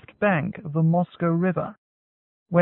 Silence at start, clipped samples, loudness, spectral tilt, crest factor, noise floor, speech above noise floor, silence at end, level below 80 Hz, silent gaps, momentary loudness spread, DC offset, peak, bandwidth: 0.2 s; under 0.1%; -24 LUFS; -13 dB/octave; 16 dB; under -90 dBFS; over 67 dB; 0 s; -60 dBFS; 1.78-2.46 s; 7 LU; under 0.1%; -8 dBFS; 3.9 kHz